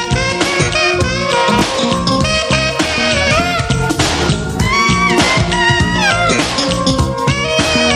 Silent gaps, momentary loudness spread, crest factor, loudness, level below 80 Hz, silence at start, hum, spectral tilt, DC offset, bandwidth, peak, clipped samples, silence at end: none; 4 LU; 14 dB; -13 LUFS; -28 dBFS; 0 s; none; -4 dB/octave; under 0.1%; 15.5 kHz; 0 dBFS; under 0.1%; 0 s